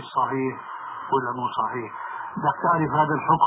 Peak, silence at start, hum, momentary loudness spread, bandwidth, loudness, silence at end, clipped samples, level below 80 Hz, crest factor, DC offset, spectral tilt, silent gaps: -6 dBFS; 0 s; none; 12 LU; 4 kHz; -25 LUFS; 0 s; under 0.1%; -62 dBFS; 18 dB; under 0.1%; -5 dB/octave; none